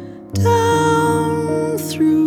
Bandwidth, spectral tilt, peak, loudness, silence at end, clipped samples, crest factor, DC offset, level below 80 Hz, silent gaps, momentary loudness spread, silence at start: 18 kHz; -6 dB/octave; -4 dBFS; -17 LUFS; 0 s; under 0.1%; 12 dB; under 0.1%; -52 dBFS; none; 6 LU; 0 s